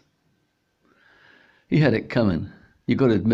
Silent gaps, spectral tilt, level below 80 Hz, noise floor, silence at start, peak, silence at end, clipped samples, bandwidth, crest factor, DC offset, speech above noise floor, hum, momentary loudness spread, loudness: none; -9 dB/octave; -54 dBFS; -70 dBFS; 1.7 s; -8 dBFS; 0 s; under 0.1%; 7.4 kHz; 16 dB; under 0.1%; 50 dB; none; 13 LU; -22 LUFS